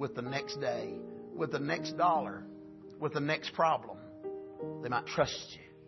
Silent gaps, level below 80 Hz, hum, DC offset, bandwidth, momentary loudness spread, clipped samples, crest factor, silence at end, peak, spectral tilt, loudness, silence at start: none; -68 dBFS; none; under 0.1%; 6.2 kHz; 16 LU; under 0.1%; 22 dB; 0 s; -14 dBFS; -3.5 dB/octave; -34 LUFS; 0 s